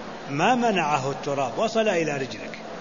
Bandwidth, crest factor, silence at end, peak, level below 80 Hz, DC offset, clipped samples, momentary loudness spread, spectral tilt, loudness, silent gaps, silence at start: 7.4 kHz; 18 dB; 0 s; -6 dBFS; -60 dBFS; 0.4%; under 0.1%; 11 LU; -4.5 dB/octave; -24 LUFS; none; 0 s